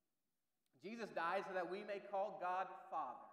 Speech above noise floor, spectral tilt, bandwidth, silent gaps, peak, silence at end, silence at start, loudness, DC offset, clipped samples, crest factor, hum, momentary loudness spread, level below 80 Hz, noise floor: over 45 dB; -5 dB/octave; 13 kHz; none; -30 dBFS; 0 s; 0.85 s; -46 LUFS; under 0.1%; under 0.1%; 16 dB; none; 8 LU; under -90 dBFS; under -90 dBFS